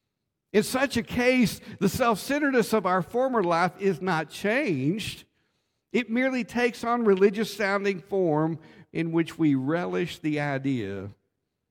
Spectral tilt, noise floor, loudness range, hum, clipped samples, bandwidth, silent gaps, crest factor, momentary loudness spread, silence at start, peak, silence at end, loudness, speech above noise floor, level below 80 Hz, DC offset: -5.5 dB/octave; -81 dBFS; 3 LU; none; under 0.1%; 17.5 kHz; none; 16 dB; 7 LU; 0.55 s; -10 dBFS; 0.55 s; -26 LUFS; 56 dB; -58 dBFS; under 0.1%